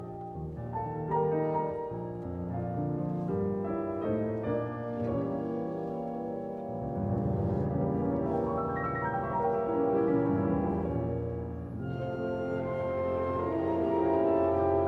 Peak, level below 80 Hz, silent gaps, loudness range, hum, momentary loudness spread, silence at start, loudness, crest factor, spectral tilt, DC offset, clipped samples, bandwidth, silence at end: -16 dBFS; -52 dBFS; none; 4 LU; none; 10 LU; 0 s; -32 LUFS; 14 dB; -10.5 dB/octave; under 0.1%; under 0.1%; 6 kHz; 0 s